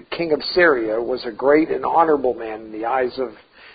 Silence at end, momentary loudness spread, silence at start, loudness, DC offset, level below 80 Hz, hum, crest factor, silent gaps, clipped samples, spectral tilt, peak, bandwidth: 0.05 s; 13 LU; 0.1 s; -19 LUFS; under 0.1%; -54 dBFS; none; 18 dB; none; under 0.1%; -9.5 dB/octave; -2 dBFS; 5 kHz